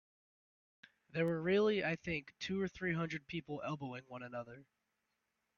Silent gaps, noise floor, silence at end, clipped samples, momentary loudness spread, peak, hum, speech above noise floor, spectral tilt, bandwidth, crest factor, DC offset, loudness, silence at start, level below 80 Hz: none; -86 dBFS; 0.95 s; under 0.1%; 15 LU; -22 dBFS; none; 47 dB; -6.5 dB/octave; 7.2 kHz; 18 dB; under 0.1%; -39 LUFS; 1.15 s; -70 dBFS